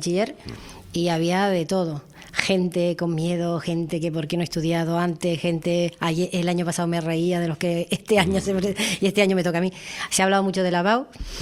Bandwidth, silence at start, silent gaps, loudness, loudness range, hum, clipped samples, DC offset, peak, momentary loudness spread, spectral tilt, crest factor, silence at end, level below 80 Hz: 14.5 kHz; 0 s; none; -23 LUFS; 3 LU; none; under 0.1%; under 0.1%; 0 dBFS; 6 LU; -5 dB/octave; 22 dB; 0 s; -48 dBFS